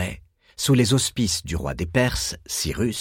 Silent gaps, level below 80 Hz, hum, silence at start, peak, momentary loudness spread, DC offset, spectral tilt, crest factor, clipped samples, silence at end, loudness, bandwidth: none; -38 dBFS; none; 0 s; -4 dBFS; 10 LU; under 0.1%; -4.5 dB/octave; 18 dB; under 0.1%; 0 s; -23 LUFS; 17 kHz